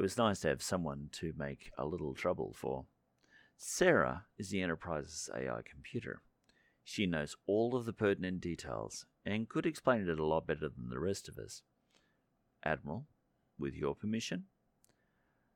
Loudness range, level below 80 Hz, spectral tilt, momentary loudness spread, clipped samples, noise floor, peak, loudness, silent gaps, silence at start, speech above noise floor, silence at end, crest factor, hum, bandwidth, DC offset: 6 LU; -62 dBFS; -5 dB/octave; 12 LU; under 0.1%; -78 dBFS; -14 dBFS; -38 LUFS; none; 0 s; 41 dB; 1.1 s; 24 dB; none; 18 kHz; under 0.1%